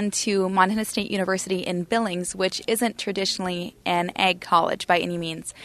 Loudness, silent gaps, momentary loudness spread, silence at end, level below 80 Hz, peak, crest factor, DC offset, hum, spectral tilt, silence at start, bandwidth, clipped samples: -24 LUFS; none; 6 LU; 0 s; -58 dBFS; -4 dBFS; 20 dB; under 0.1%; none; -3.5 dB/octave; 0 s; 13.5 kHz; under 0.1%